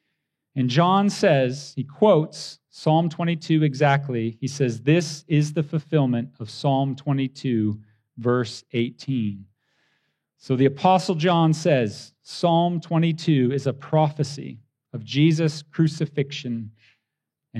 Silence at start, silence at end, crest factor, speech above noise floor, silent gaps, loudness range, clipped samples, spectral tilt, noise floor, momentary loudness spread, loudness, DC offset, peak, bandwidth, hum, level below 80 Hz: 0.55 s; 0 s; 18 dB; 61 dB; none; 4 LU; under 0.1%; -6.5 dB/octave; -83 dBFS; 12 LU; -22 LUFS; under 0.1%; -6 dBFS; 10.5 kHz; none; -72 dBFS